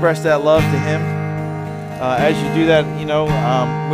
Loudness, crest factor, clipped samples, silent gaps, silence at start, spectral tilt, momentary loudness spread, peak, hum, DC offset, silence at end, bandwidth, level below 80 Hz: -17 LUFS; 14 dB; under 0.1%; none; 0 s; -6.5 dB/octave; 9 LU; -2 dBFS; none; under 0.1%; 0 s; 15 kHz; -40 dBFS